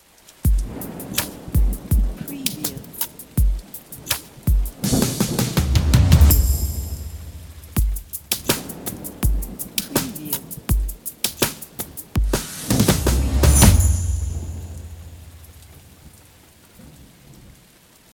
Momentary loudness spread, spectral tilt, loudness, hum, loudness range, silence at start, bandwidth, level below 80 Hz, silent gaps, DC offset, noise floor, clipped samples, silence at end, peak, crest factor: 17 LU; -4.5 dB/octave; -21 LUFS; none; 6 LU; 0.45 s; 19.5 kHz; -24 dBFS; none; under 0.1%; -51 dBFS; under 0.1%; 0.65 s; 0 dBFS; 20 dB